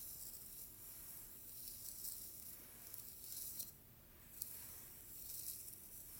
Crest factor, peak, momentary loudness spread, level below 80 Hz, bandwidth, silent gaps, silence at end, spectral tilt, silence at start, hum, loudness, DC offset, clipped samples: 36 dB; -18 dBFS; 6 LU; -72 dBFS; 17 kHz; none; 0 s; -1 dB/octave; 0 s; none; -50 LUFS; under 0.1%; under 0.1%